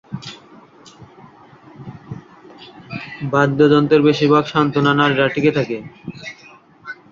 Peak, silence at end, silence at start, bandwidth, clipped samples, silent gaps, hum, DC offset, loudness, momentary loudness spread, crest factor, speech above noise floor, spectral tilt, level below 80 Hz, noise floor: -2 dBFS; 0.2 s; 0.1 s; 7.4 kHz; under 0.1%; none; none; under 0.1%; -15 LUFS; 23 LU; 18 dB; 30 dB; -7 dB/octave; -56 dBFS; -45 dBFS